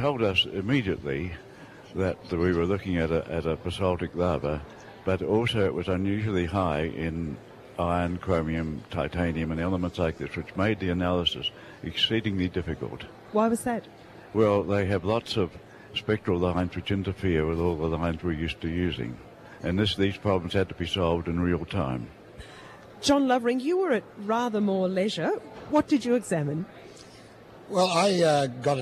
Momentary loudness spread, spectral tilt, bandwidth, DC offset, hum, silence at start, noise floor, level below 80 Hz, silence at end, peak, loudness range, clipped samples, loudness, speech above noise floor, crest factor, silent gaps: 12 LU; -6 dB/octave; 13.5 kHz; under 0.1%; none; 0 s; -49 dBFS; -46 dBFS; 0 s; -10 dBFS; 2 LU; under 0.1%; -27 LUFS; 22 dB; 16 dB; none